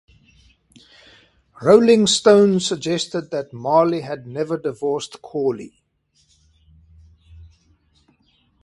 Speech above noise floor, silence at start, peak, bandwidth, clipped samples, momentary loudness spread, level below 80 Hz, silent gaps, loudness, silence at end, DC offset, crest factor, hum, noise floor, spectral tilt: 46 dB; 1.6 s; 0 dBFS; 11.5 kHz; under 0.1%; 14 LU; -56 dBFS; none; -18 LUFS; 2.95 s; under 0.1%; 20 dB; none; -64 dBFS; -4.5 dB/octave